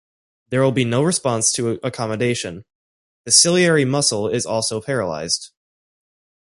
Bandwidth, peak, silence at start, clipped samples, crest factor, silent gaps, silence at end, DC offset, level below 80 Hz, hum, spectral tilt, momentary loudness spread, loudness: 11.5 kHz; 0 dBFS; 0.5 s; under 0.1%; 20 dB; 2.75-3.24 s; 1 s; under 0.1%; -56 dBFS; none; -3.5 dB/octave; 11 LU; -18 LUFS